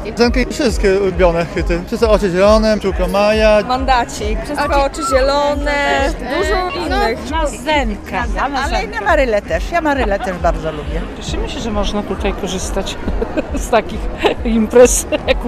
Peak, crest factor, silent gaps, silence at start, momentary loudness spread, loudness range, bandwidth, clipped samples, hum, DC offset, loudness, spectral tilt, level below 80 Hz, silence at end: 0 dBFS; 14 dB; none; 0 s; 9 LU; 6 LU; 14.5 kHz; under 0.1%; none; under 0.1%; -15 LUFS; -4.5 dB/octave; -24 dBFS; 0 s